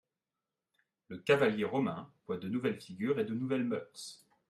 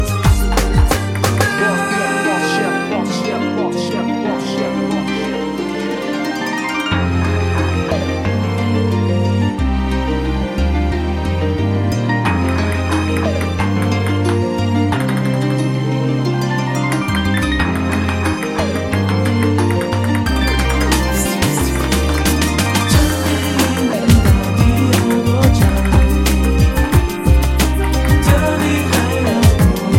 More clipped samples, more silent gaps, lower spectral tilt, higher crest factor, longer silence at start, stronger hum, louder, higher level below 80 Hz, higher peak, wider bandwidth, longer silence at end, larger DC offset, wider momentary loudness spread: neither; neither; about the same, -6 dB/octave vs -5.5 dB/octave; first, 20 dB vs 14 dB; first, 1.1 s vs 0 s; neither; second, -34 LUFS vs -16 LUFS; second, -78 dBFS vs -22 dBFS; second, -14 dBFS vs 0 dBFS; second, 13 kHz vs 17 kHz; first, 0.35 s vs 0 s; neither; first, 18 LU vs 5 LU